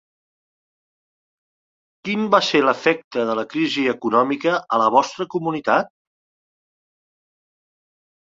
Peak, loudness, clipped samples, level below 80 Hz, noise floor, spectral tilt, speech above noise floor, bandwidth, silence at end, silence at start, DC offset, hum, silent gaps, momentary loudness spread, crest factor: 0 dBFS; -19 LUFS; under 0.1%; -68 dBFS; under -90 dBFS; -4.5 dB/octave; over 71 dB; 7.8 kHz; 2.4 s; 2.05 s; under 0.1%; none; 3.04-3.11 s; 8 LU; 22 dB